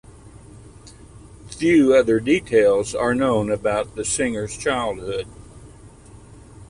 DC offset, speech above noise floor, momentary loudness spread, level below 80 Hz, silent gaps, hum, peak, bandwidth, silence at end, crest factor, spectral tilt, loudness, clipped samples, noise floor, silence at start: under 0.1%; 25 dB; 12 LU; -46 dBFS; none; none; -4 dBFS; 11.5 kHz; 0.05 s; 18 dB; -5 dB/octave; -20 LUFS; under 0.1%; -44 dBFS; 0.25 s